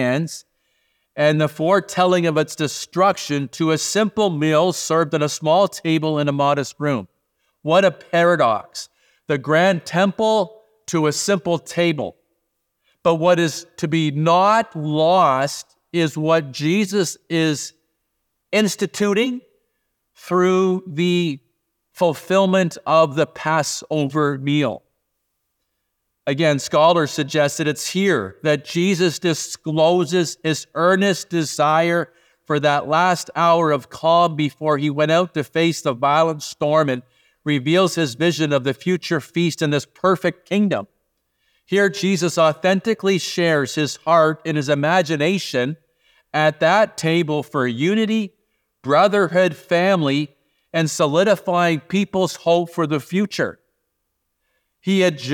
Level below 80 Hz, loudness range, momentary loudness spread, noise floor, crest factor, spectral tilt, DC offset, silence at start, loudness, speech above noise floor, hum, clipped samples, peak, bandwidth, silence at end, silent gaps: -68 dBFS; 3 LU; 8 LU; -74 dBFS; 16 dB; -5 dB/octave; under 0.1%; 0 s; -19 LUFS; 56 dB; none; under 0.1%; -2 dBFS; 19 kHz; 0 s; none